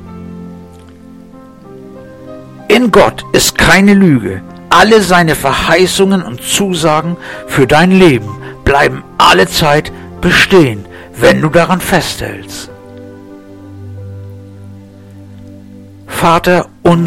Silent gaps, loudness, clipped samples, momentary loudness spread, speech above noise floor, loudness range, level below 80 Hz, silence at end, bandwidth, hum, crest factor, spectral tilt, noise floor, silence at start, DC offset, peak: none; -9 LUFS; 0.3%; 22 LU; 25 dB; 9 LU; -32 dBFS; 0 s; 16.5 kHz; none; 12 dB; -4.5 dB/octave; -34 dBFS; 0 s; 0.5%; 0 dBFS